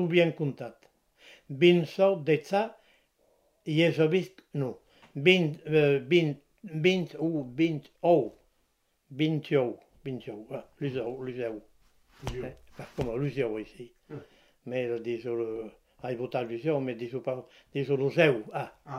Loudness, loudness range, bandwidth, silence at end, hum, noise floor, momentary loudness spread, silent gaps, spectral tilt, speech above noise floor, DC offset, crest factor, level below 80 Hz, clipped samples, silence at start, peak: -29 LUFS; 10 LU; 12 kHz; 0 s; none; -73 dBFS; 19 LU; none; -7 dB/octave; 45 dB; under 0.1%; 24 dB; -60 dBFS; under 0.1%; 0 s; -6 dBFS